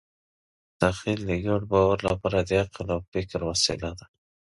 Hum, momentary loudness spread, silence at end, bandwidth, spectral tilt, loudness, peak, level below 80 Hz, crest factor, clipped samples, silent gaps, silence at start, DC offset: none; 9 LU; 0.35 s; 11.5 kHz; -4.5 dB/octave; -26 LUFS; -6 dBFS; -44 dBFS; 22 dB; under 0.1%; 3.08-3.12 s; 0.8 s; under 0.1%